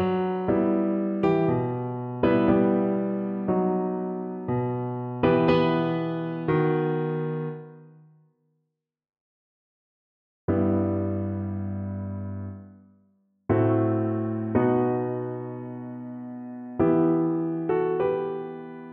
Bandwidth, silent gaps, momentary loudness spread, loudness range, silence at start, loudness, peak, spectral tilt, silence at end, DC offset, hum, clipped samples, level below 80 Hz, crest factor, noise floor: 5.4 kHz; 9.21-10.48 s; 15 LU; 7 LU; 0 s; -26 LUFS; -8 dBFS; -10.5 dB/octave; 0 s; under 0.1%; none; under 0.1%; -56 dBFS; 18 dB; -81 dBFS